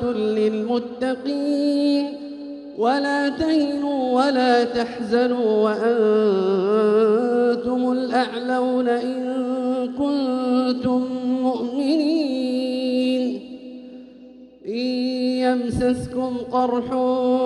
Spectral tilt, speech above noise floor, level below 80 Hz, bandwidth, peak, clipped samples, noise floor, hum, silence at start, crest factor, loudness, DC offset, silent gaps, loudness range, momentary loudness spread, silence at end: -6 dB/octave; 24 dB; -54 dBFS; 11 kHz; -4 dBFS; under 0.1%; -44 dBFS; none; 0 s; 16 dB; -21 LUFS; under 0.1%; none; 5 LU; 8 LU; 0 s